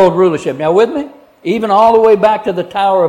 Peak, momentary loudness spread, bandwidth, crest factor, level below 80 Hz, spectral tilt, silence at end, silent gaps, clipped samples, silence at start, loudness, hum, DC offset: 0 dBFS; 12 LU; 10.5 kHz; 10 dB; -50 dBFS; -6.5 dB/octave; 0 s; none; under 0.1%; 0 s; -11 LUFS; none; under 0.1%